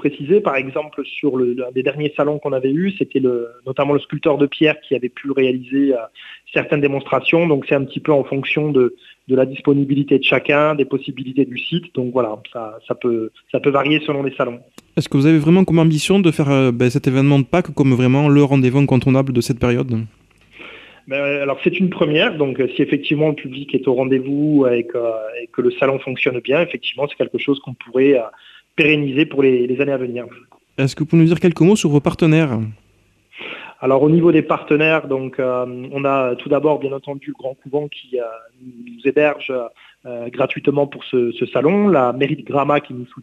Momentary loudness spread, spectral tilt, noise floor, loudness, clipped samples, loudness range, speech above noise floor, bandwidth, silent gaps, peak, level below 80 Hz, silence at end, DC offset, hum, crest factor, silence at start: 12 LU; -7 dB/octave; -57 dBFS; -17 LUFS; under 0.1%; 6 LU; 40 dB; 12.5 kHz; none; -2 dBFS; -52 dBFS; 0 s; under 0.1%; none; 16 dB; 0 s